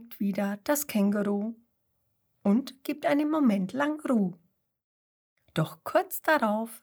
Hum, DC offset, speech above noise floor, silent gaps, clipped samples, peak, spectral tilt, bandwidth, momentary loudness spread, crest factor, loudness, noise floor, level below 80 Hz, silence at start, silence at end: none; under 0.1%; 48 dB; 4.84-5.36 s; under 0.1%; -10 dBFS; -5.5 dB/octave; over 20 kHz; 7 LU; 18 dB; -28 LUFS; -75 dBFS; -76 dBFS; 0 s; 0.05 s